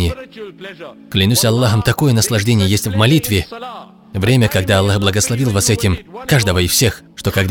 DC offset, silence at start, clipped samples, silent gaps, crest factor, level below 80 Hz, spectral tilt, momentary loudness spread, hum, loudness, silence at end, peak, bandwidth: under 0.1%; 0 s; under 0.1%; none; 14 dB; -36 dBFS; -4.5 dB/octave; 18 LU; none; -14 LUFS; 0 s; 0 dBFS; 19.5 kHz